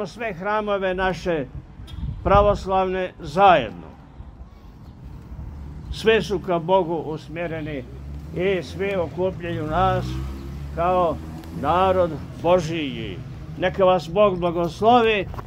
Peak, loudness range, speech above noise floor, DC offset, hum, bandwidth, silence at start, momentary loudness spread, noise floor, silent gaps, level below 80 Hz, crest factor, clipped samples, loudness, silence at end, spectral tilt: -2 dBFS; 4 LU; 21 dB; under 0.1%; none; 15.5 kHz; 0 s; 19 LU; -42 dBFS; none; -38 dBFS; 20 dB; under 0.1%; -22 LUFS; 0 s; -6.5 dB/octave